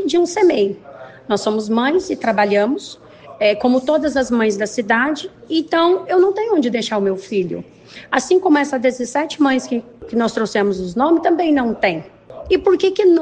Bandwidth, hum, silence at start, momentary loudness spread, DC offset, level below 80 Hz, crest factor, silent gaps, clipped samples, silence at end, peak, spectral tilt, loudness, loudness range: 9.4 kHz; none; 0 s; 9 LU; under 0.1%; -50 dBFS; 14 dB; none; under 0.1%; 0 s; -2 dBFS; -4.5 dB/octave; -17 LUFS; 2 LU